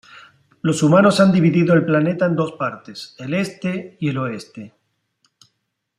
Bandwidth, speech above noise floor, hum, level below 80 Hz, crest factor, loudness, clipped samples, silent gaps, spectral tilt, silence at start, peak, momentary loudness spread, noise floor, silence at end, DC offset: 12.5 kHz; 56 dB; none; -60 dBFS; 18 dB; -18 LUFS; under 0.1%; none; -6.5 dB/octave; 0.65 s; -2 dBFS; 19 LU; -74 dBFS; 1.3 s; under 0.1%